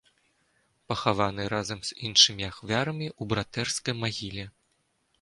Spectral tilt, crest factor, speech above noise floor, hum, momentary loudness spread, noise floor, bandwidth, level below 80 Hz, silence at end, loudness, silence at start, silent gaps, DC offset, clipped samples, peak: -3 dB/octave; 24 dB; 44 dB; none; 16 LU; -73 dBFS; 11.5 kHz; -56 dBFS; 0.7 s; -27 LUFS; 0.9 s; none; under 0.1%; under 0.1%; -6 dBFS